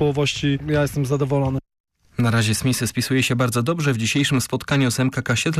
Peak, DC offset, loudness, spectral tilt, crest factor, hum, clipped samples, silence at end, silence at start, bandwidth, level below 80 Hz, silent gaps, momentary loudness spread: -10 dBFS; under 0.1%; -21 LUFS; -5 dB/octave; 10 dB; none; under 0.1%; 0 s; 0 s; 15.5 kHz; -46 dBFS; 1.80-1.84 s; 4 LU